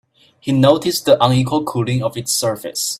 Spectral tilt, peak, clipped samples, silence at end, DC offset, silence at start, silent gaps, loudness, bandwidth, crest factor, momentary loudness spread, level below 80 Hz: -5 dB/octave; 0 dBFS; under 0.1%; 0.05 s; under 0.1%; 0.45 s; none; -16 LUFS; 16 kHz; 16 dB; 8 LU; -52 dBFS